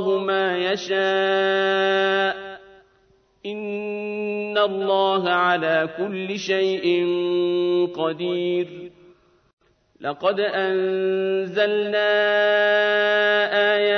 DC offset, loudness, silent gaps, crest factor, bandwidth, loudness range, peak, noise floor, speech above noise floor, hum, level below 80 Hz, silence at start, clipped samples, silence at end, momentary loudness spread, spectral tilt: under 0.1%; -21 LUFS; 9.53-9.57 s; 16 dB; 6.6 kHz; 5 LU; -6 dBFS; -60 dBFS; 39 dB; none; -70 dBFS; 0 s; under 0.1%; 0 s; 10 LU; -5 dB/octave